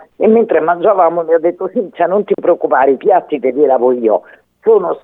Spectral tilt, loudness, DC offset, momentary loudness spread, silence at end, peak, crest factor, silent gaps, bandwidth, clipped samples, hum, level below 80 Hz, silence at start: -9.5 dB/octave; -13 LUFS; under 0.1%; 6 LU; 0.05 s; 0 dBFS; 12 dB; none; 3.8 kHz; under 0.1%; none; -64 dBFS; 0.2 s